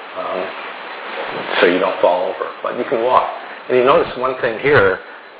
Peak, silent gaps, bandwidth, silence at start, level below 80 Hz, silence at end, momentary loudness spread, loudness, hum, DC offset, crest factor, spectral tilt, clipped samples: 0 dBFS; none; 4 kHz; 0 s; -52 dBFS; 0 s; 13 LU; -17 LUFS; none; under 0.1%; 18 dB; -8.5 dB/octave; under 0.1%